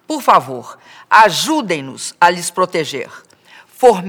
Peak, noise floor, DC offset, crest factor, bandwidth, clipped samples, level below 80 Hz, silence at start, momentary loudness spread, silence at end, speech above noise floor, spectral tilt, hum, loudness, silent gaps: 0 dBFS; -45 dBFS; under 0.1%; 16 dB; over 20 kHz; 0.3%; -60 dBFS; 0.1 s; 17 LU; 0 s; 30 dB; -3 dB/octave; none; -14 LUFS; none